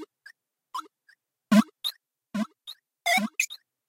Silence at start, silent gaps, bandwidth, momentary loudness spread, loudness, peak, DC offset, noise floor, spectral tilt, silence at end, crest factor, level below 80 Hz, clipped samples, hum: 0 s; none; 16 kHz; 19 LU; -27 LUFS; -8 dBFS; under 0.1%; -65 dBFS; -4 dB/octave; 0.35 s; 22 dB; -76 dBFS; under 0.1%; none